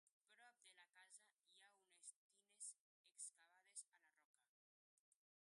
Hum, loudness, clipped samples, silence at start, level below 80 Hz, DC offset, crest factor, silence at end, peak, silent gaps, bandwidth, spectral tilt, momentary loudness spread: none; -61 LUFS; under 0.1%; 0.05 s; under -90 dBFS; under 0.1%; 26 dB; 0.45 s; -42 dBFS; 0.12-0.21 s, 2.16-2.30 s, 2.81-3.04 s, 4.25-4.34 s, 4.48-5.12 s; 11.5 kHz; 3.5 dB/octave; 11 LU